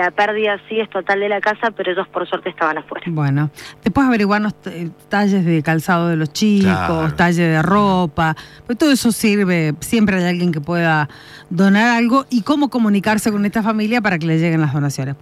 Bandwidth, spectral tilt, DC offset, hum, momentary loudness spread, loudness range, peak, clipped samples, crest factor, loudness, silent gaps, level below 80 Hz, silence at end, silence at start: 15 kHz; -6 dB/octave; under 0.1%; none; 8 LU; 3 LU; -2 dBFS; under 0.1%; 14 dB; -17 LUFS; none; -48 dBFS; 0.05 s; 0 s